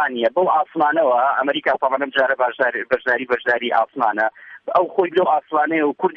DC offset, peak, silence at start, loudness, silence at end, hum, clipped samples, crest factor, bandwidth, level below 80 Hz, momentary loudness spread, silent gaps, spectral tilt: under 0.1%; -4 dBFS; 0 s; -19 LUFS; 0 s; none; under 0.1%; 14 dB; 6.2 kHz; -66 dBFS; 3 LU; none; -6.5 dB/octave